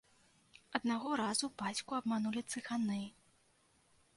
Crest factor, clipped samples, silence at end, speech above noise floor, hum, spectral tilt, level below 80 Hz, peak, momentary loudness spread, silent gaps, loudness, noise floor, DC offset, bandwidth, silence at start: 24 dB; under 0.1%; 1.05 s; 34 dB; none; -3.5 dB/octave; -76 dBFS; -16 dBFS; 6 LU; none; -38 LUFS; -72 dBFS; under 0.1%; 11.5 kHz; 0.7 s